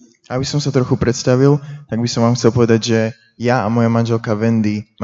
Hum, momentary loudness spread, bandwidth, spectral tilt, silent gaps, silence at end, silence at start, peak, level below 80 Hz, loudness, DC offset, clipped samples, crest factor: none; 8 LU; 7.8 kHz; -6.5 dB/octave; none; 0 s; 0.3 s; 0 dBFS; -46 dBFS; -16 LUFS; under 0.1%; under 0.1%; 16 dB